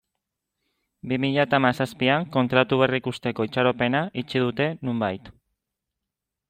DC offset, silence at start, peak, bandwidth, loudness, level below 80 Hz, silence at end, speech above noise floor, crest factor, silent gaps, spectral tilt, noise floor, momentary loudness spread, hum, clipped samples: under 0.1%; 1.05 s; -6 dBFS; 15 kHz; -23 LUFS; -62 dBFS; 1.2 s; 62 dB; 20 dB; none; -7 dB/octave; -85 dBFS; 8 LU; none; under 0.1%